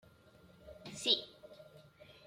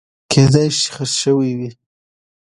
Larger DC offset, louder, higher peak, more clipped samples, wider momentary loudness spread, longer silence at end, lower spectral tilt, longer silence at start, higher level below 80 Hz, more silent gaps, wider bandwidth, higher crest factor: neither; second, -33 LUFS vs -15 LUFS; second, -16 dBFS vs 0 dBFS; neither; first, 25 LU vs 11 LU; second, 0 s vs 0.8 s; second, -2 dB/octave vs -5 dB/octave; first, 0.45 s vs 0.3 s; second, -72 dBFS vs -48 dBFS; neither; first, 16.5 kHz vs 11.5 kHz; first, 26 dB vs 18 dB